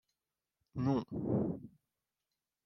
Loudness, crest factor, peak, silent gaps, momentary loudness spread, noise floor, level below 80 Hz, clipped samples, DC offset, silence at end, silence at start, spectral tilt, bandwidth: -37 LUFS; 20 dB; -20 dBFS; none; 11 LU; under -90 dBFS; -64 dBFS; under 0.1%; under 0.1%; 0.95 s; 0.75 s; -10 dB/octave; 6.2 kHz